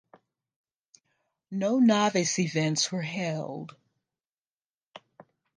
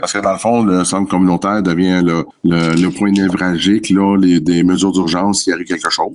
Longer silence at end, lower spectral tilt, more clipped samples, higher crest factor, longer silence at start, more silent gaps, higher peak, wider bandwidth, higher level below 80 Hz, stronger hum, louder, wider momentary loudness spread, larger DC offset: first, 0.6 s vs 0 s; about the same, -4.5 dB/octave vs -5 dB/octave; neither; first, 20 dB vs 12 dB; first, 1.5 s vs 0 s; first, 4.29-4.45 s, 4.53-4.57 s, 4.74-4.78 s, 4.87-4.91 s vs none; second, -10 dBFS vs -2 dBFS; second, 10 kHz vs 11.5 kHz; second, -78 dBFS vs -48 dBFS; neither; second, -27 LUFS vs -14 LUFS; first, 16 LU vs 4 LU; neither